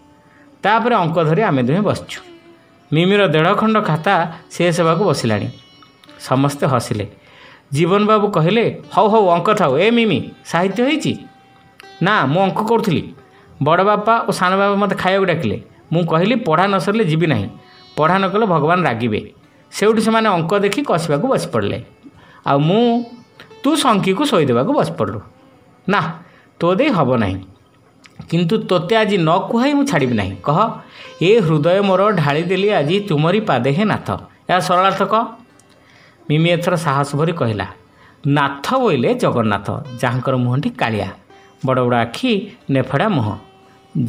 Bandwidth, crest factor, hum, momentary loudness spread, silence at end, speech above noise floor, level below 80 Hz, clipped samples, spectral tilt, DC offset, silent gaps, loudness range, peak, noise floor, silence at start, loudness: 16 kHz; 16 dB; none; 10 LU; 0 s; 35 dB; -54 dBFS; under 0.1%; -6 dB/octave; under 0.1%; none; 3 LU; 0 dBFS; -50 dBFS; 0.65 s; -16 LUFS